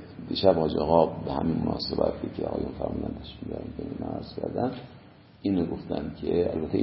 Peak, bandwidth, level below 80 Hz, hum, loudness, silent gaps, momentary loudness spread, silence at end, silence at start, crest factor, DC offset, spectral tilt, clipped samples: -4 dBFS; 5.8 kHz; -46 dBFS; none; -28 LUFS; none; 13 LU; 0 s; 0 s; 24 dB; under 0.1%; -11 dB/octave; under 0.1%